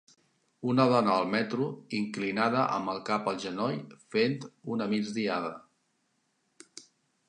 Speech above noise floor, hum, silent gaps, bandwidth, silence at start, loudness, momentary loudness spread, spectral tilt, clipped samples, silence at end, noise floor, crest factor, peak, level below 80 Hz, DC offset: 46 dB; none; none; 10.5 kHz; 0.6 s; -30 LUFS; 14 LU; -6 dB/octave; under 0.1%; 0.45 s; -75 dBFS; 22 dB; -10 dBFS; -76 dBFS; under 0.1%